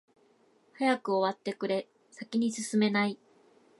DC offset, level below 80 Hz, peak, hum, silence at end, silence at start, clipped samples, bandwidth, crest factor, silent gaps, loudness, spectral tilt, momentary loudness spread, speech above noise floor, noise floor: under 0.1%; -82 dBFS; -14 dBFS; none; 0.65 s; 0.8 s; under 0.1%; 11.5 kHz; 18 dB; none; -30 LUFS; -4.5 dB/octave; 13 LU; 36 dB; -66 dBFS